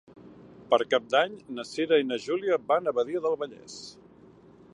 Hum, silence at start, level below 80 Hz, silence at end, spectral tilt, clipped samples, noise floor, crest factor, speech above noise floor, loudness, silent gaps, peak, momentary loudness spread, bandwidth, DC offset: none; 0.15 s; -72 dBFS; 0.8 s; -4 dB/octave; under 0.1%; -54 dBFS; 20 dB; 27 dB; -27 LUFS; none; -8 dBFS; 16 LU; 11 kHz; under 0.1%